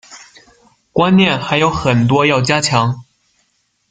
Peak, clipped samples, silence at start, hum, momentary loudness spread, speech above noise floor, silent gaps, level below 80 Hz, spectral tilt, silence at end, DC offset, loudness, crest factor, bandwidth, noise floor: 0 dBFS; under 0.1%; 0.1 s; none; 8 LU; 50 dB; none; -44 dBFS; -5 dB/octave; 0.9 s; under 0.1%; -13 LUFS; 16 dB; 9.4 kHz; -63 dBFS